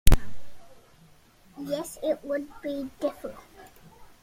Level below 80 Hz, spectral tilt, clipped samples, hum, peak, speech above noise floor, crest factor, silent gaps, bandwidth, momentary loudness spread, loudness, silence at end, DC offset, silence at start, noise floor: -32 dBFS; -5.5 dB/octave; under 0.1%; none; -2 dBFS; 24 dB; 24 dB; none; 16.5 kHz; 22 LU; -32 LUFS; 0.15 s; under 0.1%; 0.05 s; -56 dBFS